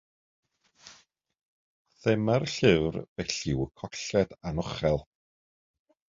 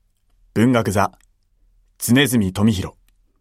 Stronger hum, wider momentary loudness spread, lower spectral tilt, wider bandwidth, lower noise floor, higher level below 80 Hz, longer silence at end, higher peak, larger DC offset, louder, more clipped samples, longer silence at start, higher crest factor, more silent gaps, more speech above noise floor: neither; about the same, 10 LU vs 11 LU; about the same, -5.5 dB/octave vs -5 dB/octave; second, 7.8 kHz vs 16 kHz; about the same, -60 dBFS vs -59 dBFS; about the same, -50 dBFS vs -50 dBFS; first, 1.1 s vs 0.5 s; second, -6 dBFS vs -2 dBFS; neither; second, -28 LUFS vs -18 LUFS; neither; first, 0.85 s vs 0.55 s; first, 24 dB vs 18 dB; first, 1.45-1.85 s, 3.08-3.16 s vs none; second, 32 dB vs 42 dB